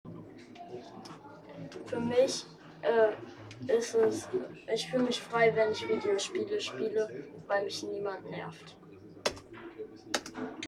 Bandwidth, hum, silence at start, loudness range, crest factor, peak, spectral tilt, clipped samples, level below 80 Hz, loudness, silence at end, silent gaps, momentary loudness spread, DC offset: 13 kHz; none; 0.05 s; 7 LU; 20 dB; -12 dBFS; -4 dB/octave; under 0.1%; -70 dBFS; -32 LUFS; 0 s; none; 21 LU; under 0.1%